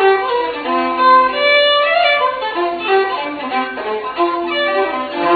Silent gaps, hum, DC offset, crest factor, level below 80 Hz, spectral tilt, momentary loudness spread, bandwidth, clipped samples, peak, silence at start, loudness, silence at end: none; none; under 0.1%; 14 dB; -54 dBFS; -5.5 dB/octave; 9 LU; 4.9 kHz; under 0.1%; 0 dBFS; 0 s; -15 LUFS; 0 s